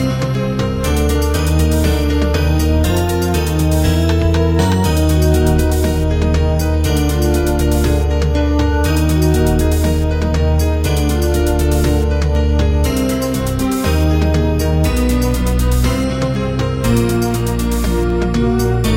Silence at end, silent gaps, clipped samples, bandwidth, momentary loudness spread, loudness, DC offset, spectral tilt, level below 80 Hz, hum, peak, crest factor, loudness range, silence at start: 0 s; none; under 0.1%; 16.5 kHz; 3 LU; -15 LUFS; under 0.1%; -6 dB/octave; -18 dBFS; none; -2 dBFS; 12 dB; 1 LU; 0 s